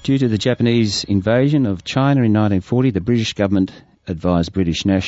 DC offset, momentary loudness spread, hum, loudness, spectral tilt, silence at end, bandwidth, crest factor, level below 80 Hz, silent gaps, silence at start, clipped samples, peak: under 0.1%; 5 LU; none; -17 LUFS; -6.5 dB/octave; 0 s; 8 kHz; 14 dB; -42 dBFS; none; 0.05 s; under 0.1%; -2 dBFS